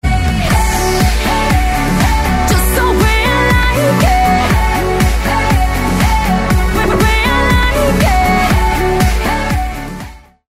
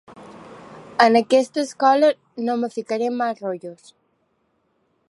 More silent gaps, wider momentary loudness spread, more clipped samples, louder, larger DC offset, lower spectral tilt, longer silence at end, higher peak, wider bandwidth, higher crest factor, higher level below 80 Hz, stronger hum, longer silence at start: neither; second, 4 LU vs 25 LU; neither; first, -12 LUFS vs -20 LUFS; neither; about the same, -5 dB/octave vs -4 dB/octave; second, 0.3 s vs 1.35 s; about the same, 0 dBFS vs 0 dBFS; first, 16 kHz vs 11.5 kHz; second, 10 dB vs 22 dB; first, -16 dBFS vs -72 dBFS; neither; about the same, 0.05 s vs 0.1 s